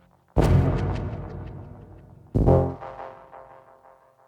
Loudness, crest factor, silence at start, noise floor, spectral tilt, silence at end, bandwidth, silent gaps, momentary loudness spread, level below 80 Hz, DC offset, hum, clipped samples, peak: -24 LUFS; 20 dB; 0.35 s; -55 dBFS; -9 dB/octave; 0.85 s; 10.5 kHz; none; 24 LU; -34 dBFS; under 0.1%; none; under 0.1%; -6 dBFS